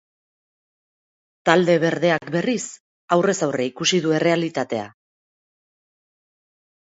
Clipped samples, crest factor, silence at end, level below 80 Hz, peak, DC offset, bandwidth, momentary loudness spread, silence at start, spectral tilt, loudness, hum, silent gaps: under 0.1%; 22 dB; 1.95 s; -68 dBFS; 0 dBFS; under 0.1%; 8 kHz; 10 LU; 1.45 s; -4.5 dB/octave; -20 LUFS; none; 2.80-3.08 s